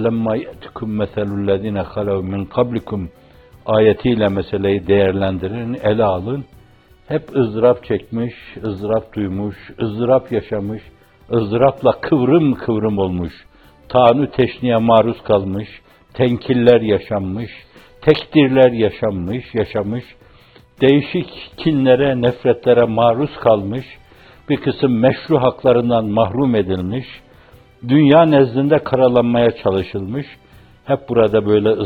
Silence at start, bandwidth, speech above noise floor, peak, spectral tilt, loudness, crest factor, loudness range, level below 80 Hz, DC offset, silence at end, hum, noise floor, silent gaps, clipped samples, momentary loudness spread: 0 s; 4.9 kHz; 32 dB; 0 dBFS; -9.5 dB/octave; -16 LUFS; 16 dB; 5 LU; -46 dBFS; under 0.1%; 0 s; none; -47 dBFS; none; under 0.1%; 13 LU